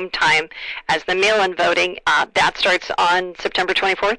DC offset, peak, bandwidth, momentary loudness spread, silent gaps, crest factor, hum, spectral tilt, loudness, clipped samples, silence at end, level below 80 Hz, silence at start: under 0.1%; -8 dBFS; 10.5 kHz; 6 LU; none; 12 dB; none; -2 dB/octave; -17 LUFS; under 0.1%; 0 s; -50 dBFS; 0 s